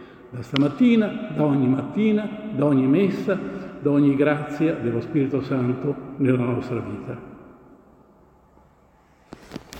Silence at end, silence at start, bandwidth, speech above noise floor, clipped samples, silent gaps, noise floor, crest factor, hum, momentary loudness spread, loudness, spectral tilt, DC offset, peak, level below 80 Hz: 0 s; 0 s; 8.8 kHz; 35 dB; under 0.1%; none; -56 dBFS; 18 dB; none; 15 LU; -22 LUFS; -8.5 dB/octave; under 0.1%; -4 dBFS; -58 dBFS